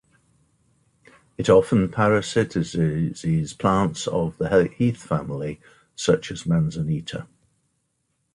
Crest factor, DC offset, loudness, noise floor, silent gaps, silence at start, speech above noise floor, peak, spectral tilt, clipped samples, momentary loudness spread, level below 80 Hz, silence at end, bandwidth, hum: 20 dB; under 0.1%; -22 LUFS; -73 dBFS; none; 1.4 s; 51 dB; -4 dBFS; -6.5 dB/octave; under 0.1%; 12 LU; -48 dBFS; 1.1 s; 11.5 kHz; none